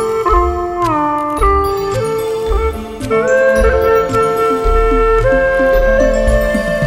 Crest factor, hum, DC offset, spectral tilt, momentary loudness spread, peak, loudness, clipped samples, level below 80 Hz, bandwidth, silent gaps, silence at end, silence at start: 12 dB; none; under 0.1%; -6 dB/octave; 6 LU; 0 dBFS; -13 LUFS; under 0.1%; -20 dBFS; 16.5 kHz; none; 0 s; 0 s